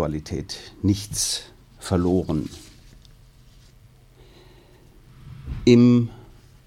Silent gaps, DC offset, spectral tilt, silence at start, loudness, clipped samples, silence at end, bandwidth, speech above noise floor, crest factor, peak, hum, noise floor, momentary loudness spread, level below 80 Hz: none; under 0.1%; -5.5 dB/octave; 0 s; -21 LUFS; under 0.1%; 0.5 s; 15.5 kHz; 31 dB; 20 dB; -4 dBFS; none; -51 dBFS; 22 LU; -44 dBFS